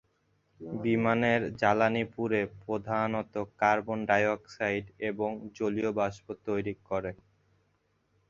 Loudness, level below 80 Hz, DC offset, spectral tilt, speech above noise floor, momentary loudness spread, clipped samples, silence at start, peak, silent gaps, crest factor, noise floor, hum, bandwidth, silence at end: -30 LUFS; -62 dBFS; under 0.1%; -6.5 dB/octave; 43 dB; 9 LU; under 0.1%; 0.6 s; -10 dBFS; none; 22 dB; -73 dBFS; none; 7.4 kHz; 1.15 s